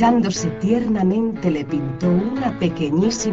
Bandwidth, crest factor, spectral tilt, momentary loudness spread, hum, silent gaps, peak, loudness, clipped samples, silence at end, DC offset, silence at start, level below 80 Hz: 8 kHz; 14 dB; -6.5 dB/octave; 4 LU; none; none; -4 dBFS; -20 LUFS; under 0.1%; 0 s; under 0.1%; 0 s; -46 dBFS